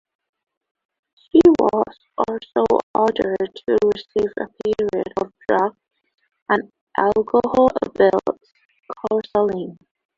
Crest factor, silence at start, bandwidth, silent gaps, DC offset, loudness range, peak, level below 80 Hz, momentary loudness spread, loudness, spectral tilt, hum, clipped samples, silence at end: 18 dB; 1.35 s; 7.4 kHz; 2.83-2.94 s, 6.42-6.46 s, 6.81-6.87 s, 8.65-8.69 s; under 0.1%; 4 LU; -2 dBFS; -54 dBFS; 11 LU; -20 LUFS; -7 dB/octave; none; under 0.1%; 0.45 s